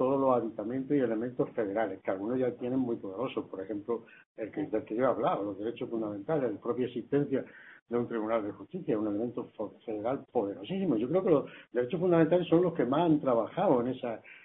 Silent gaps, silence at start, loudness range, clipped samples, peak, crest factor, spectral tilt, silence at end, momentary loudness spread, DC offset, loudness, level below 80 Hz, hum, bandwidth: 4.26-4.35 s, 7.82-7.86 s; 0 s; 6 LU; under 0.1%; -12 dBFS; 20 dB; -11 dB/octave; 0.05 s; 11 LU; under 0.1%; -31 LUFS; -70 dBFS; none; 4 kHz